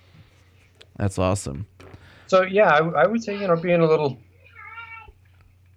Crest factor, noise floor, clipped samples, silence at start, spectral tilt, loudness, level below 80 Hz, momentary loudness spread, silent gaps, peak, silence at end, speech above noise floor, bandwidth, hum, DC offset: 18 dB; -55 dBFS; under 0.1%; 1 s; -6 dB/octave; -21 LUFS; -52 dBFS; 23 LU; none; -6 dBFS; 0.75 s; 35 dB; 12.5 kHz; none; under 0.1%